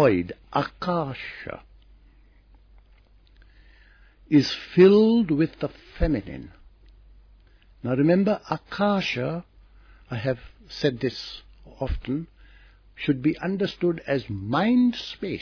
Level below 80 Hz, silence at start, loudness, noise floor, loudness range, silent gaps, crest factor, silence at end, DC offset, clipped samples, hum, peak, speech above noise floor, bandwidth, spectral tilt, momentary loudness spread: -42 dBFS; 0 s; -24 LUFS; -55 dBFS; 9 LU; none; 20 dB; 0 s; under 0.1%; under 0.1%; none; -4 dBFS; 32 dB; 5.4 kHz; -7.5 dB/octave; 16 LU